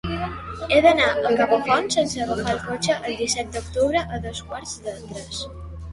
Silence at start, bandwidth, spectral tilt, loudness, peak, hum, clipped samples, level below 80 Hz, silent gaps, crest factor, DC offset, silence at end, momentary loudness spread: 0.05 s; 11.5 kHz; -3.5 dB/octave; -22 LUFS; -4 dBFS; none; under 0.1%; -42 dBFS; none; 20 dB; under 0.1%; 0 s; 16 LU